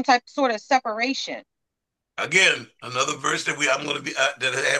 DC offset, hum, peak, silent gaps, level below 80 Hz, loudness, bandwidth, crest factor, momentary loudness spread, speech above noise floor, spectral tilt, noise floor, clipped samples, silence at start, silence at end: under 0.1%; none; -4 dBFS; none; -74 dBFS; -22 LUFS; 12.5 kHz; 20 dB; 13 LU; 60 dB; -2 dB/octave; -83 dBFS; under 0.1%; 0 s; 0 s